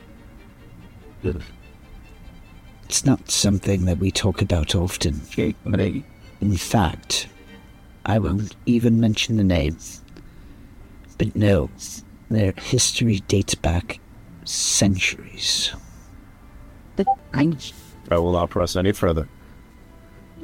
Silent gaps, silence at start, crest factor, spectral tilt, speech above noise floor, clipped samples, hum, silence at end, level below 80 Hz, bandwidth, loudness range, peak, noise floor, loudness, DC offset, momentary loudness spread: none; 0.1 s; 20 dB; -4.5 dB/octave; 25 dB; under 0.1%; none; 0 s; -38 dBFS; 16.5 kHz; 3 LU; -4 dBFS; -46 dBFS; -21 LUFS; under 0.1%; 16 LU